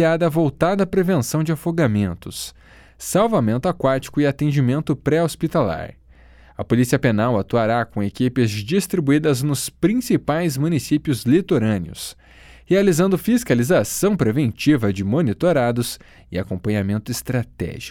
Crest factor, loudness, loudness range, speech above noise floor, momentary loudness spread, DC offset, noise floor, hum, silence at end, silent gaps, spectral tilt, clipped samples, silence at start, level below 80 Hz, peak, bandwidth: 18 dB; -20 LUFS; 2 LU; 28 dB; 10 LU; under 0.1%; -47 dBFS; none; 0 s; none; -6 dB/octave; under 0.1%; 0 s; -46 dBFS; -2 dBFS; 18.5 kHz